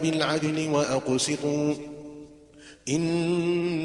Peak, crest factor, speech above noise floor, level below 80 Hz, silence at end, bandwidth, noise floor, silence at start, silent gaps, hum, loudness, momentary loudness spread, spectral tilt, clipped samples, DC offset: -8 dBFS; 18 dB; 25 dB; -62 dBFS; 0 s; 11.5 kHz; -50 dBFS; 0 s; none; none; -26 LUFS; 15 LU; -5 dB/octave; under 0.1%; under 0.1%